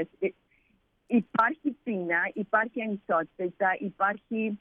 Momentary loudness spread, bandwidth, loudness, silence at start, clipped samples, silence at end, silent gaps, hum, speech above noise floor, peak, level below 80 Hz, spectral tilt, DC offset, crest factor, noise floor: 7 LU; 4.4 kHz; -29 LUFS; 0 s; under 0.1%; 0.05 s; none; none; 41 dB; -10 dBFS; -74 dBFS; -8.5 dB/octave; under 0.1%; 18 dB; -69 dBFS